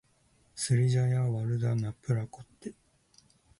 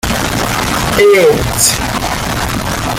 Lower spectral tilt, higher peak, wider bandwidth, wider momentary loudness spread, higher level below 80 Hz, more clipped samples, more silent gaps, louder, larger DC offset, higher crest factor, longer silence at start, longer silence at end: first, -6 dB/octave vs -3.5 dB/octave; second, -16 dBFS vs 0 dBFS; second, 11.5 kHz vs 17 kHz; first, 20 LU vs 8 LU; second, -60 dBFS vs -26 dBFS; neither; neither; second, -30 LUFS vs -12 LUFS; neither; about the same, 16 dB vs 12 dB; first, 0.55 s vs 0.05 s; first, 0.85 s vs 0 s